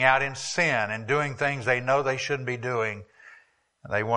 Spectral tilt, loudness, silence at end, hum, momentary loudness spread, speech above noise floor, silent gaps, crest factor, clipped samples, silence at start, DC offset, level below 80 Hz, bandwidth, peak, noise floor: -4 dB/octave; -26 LUFS; 0 s; none; 6 LU; 34 dB; none; 22 dB; under 0.1%; 0 s; under 0.1%; -64 dBFS; 11 kHz; -4 dBFS; -60 dBFS